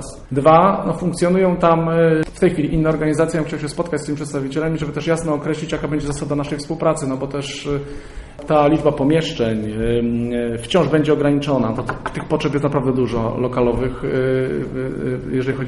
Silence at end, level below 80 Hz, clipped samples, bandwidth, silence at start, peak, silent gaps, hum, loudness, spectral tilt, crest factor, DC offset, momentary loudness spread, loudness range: 0 s; -38 dBFS; under 0.1%; 11.5 kHz; 0 s; -2 dBFS; none; none; -19 LUFS; -6.5 dB/octave; 16 dB; under 0.1%; 9 LU; 5 LU